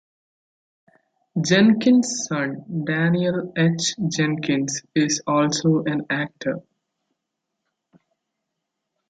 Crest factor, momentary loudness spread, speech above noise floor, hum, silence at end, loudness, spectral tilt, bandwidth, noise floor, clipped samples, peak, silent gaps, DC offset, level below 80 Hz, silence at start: 18 dB; 10 LU; 60 dB; none; 2.5 s; -21 LUFS; -4.5 dB/octave; 9.4 kHz; -80 dBFS; under 0.1%; -4 dBFS; none; under 0.1%; -64 dBFS; 1.35 s